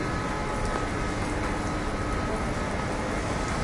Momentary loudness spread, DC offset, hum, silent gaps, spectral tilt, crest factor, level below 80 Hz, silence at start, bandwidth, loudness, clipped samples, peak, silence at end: 1 LU; under 0.1%; none; none; -5.5 dB/octave; 14 dB; -36 dBFS; 0 s; 11.5 kHz; -29 LUFS; under 0.1%; -14 dBFS; 0 s